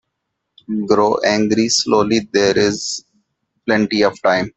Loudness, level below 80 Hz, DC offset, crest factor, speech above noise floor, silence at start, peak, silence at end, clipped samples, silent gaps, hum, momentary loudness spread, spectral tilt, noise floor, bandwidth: -16 LUFS; -54 dBFS; under 0.1%; 16 dB; 59 dB; 0.7 s; 0 dBFS; 0.1 s; under 0.1%; none; none; 10 LU; -3.5 dB/octave; -75 dBFS; 8.4 kHz